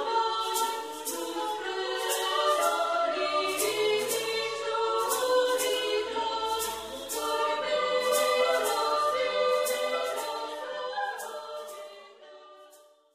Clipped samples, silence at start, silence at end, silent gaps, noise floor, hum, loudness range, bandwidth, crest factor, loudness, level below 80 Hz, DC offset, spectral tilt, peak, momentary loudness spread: under 0.1%; 0 s; 0.4 s; none; -57 dBFS; none; 4 LU; 15.5 kHz; 16 dB; -28 LUFS; -70 dBFS; under 0.1%; -0.5 dB/octave; -14 dBFS; 9 LU